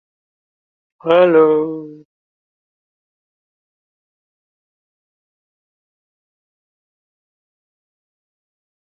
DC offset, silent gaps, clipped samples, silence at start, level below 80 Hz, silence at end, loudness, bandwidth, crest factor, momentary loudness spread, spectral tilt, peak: under 0.1%; none; under 0.1%; 1.05 s; -70 dBFS; 6.85 s; -13 LUFS; 4.3 kHz; 22 dB; 17 LU; -8.5 dB/octave; 0 dBFS